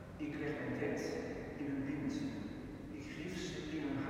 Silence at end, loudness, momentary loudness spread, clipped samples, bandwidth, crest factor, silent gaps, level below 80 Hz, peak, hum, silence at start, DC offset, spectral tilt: 0 s; -42 LUFS; 8 LU; under 0.1%; 15.5 kHz; 16 dB; none; -60 dBFS; -26 dBFS; none; 0 s; under 0.1%; -6 dB/octave